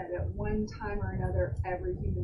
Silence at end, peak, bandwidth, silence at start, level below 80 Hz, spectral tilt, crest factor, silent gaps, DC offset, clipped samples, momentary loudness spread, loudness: 0 s; -18 dBFS; 6.2 kHz; 0 s; -40 dBFS; -9 dB/octave; 14 dB; none; under 0.1%; under 0.1%; 4 LU; -34 LUFS